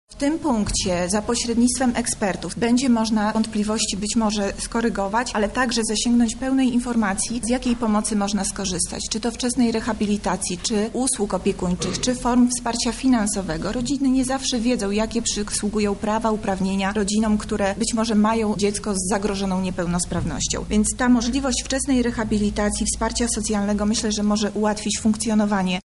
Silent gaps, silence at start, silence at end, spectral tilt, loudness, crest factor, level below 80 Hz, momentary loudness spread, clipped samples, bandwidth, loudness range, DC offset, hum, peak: none; 0.1 s; 0.05 s; -4 dB/octave; -22 LUFS; 14 dB; -38 dBFS; 4 LU; under 0.1%; 11.5 kHz; 1 LU; 0.1%; none; -8 dBFS